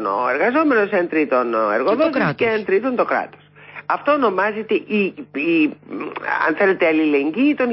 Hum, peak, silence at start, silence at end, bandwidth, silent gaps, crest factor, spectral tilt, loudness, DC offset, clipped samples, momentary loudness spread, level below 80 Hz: none; -6 dBFS; 0 s; 0 s; 5.8 kHz; none; 12 dB; -10.5 dB/octave; -18 LUFS; under 0.1%; under 0.1%; 8 LU; -66 dBFS